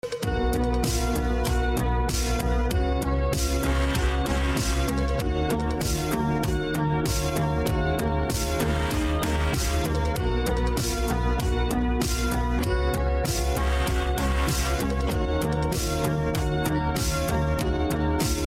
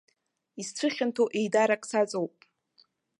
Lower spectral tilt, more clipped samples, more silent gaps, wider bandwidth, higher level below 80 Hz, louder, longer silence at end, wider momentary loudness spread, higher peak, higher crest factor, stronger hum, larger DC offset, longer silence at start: about the same, -5 dB/octave vs -4 dB/octave; neither; neither; first, 16.5 kHz vs 11.5 kHz; first, -28 dBFS vs -82 dBFS; about the same, -26 LUFS vs -28 LUFS; second, 0.05 s vs 0.9 s; second, 1 LU vs 13 LU; about the same, -14 dBFS vs -12 dBFS; second, 10 dB vs 18 dB; neither; neither; second, 0.05 s vs 0.55 s